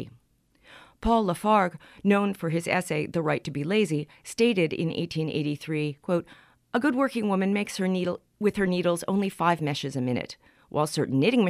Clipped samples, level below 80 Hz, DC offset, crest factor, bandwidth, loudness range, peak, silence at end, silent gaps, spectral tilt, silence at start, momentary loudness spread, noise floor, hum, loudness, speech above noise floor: under 0.1%; -50 dBFS; under 0.1%; 18 dB; 15.5 kHz; 2 LU; -8 dBFS; 0 s; none; -6 dB/octave; 0 s; 7 LU; -64 dBFS; none; -27 LUFS; 38 dB